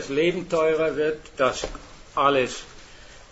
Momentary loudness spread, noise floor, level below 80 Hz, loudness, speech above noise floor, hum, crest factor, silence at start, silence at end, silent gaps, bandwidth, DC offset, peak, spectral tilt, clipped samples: 15 LU; -45 dBFS; -48 dBFS; -24 LUFS; 22 dB; none; 20 dB; 0 s; 0.1 s; none; 8 kHz; under 0.1%; -4 dBFS; -4.5 dB/octave; under 0.1%